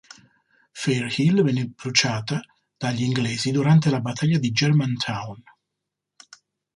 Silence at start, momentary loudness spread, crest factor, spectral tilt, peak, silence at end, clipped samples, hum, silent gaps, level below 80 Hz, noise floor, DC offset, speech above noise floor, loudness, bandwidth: 0.75 s; 11 LU; 20 dB; -5 dB/octave; -4 dBFS; 1.35 s; under 0.1%; 50 Hz at -40 dBFS; none; -60 dBFS; -83 dBFS; under 0.1%; 61 dB; -22 LUFS; 11.5 kHz